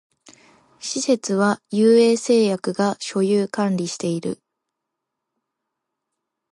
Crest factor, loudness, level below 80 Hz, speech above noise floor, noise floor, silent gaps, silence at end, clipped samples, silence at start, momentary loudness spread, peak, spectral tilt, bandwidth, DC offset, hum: 16 dB; -20 LUFS; -72 dBFS; 62 dB; -81 dBFS; none; 2.2 s; under 0.1%; 0.8 s; 12 LU; -6 dBFS; -5 dB/octave; 11.5 kHz; under 0.1%; none